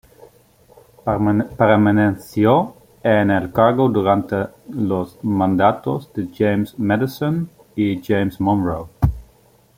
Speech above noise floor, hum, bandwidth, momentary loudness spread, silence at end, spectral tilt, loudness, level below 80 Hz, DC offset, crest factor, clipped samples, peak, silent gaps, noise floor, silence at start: 36 dB; none; 16.5 kHz; 10 LU; 0.55 s; -8.5 dB/octave; -19 LUFS; -40 dBFS; under 0.1%; 16 dB; under 0.1%; -2 dBFS; none; -53 dBFS; 1.05 s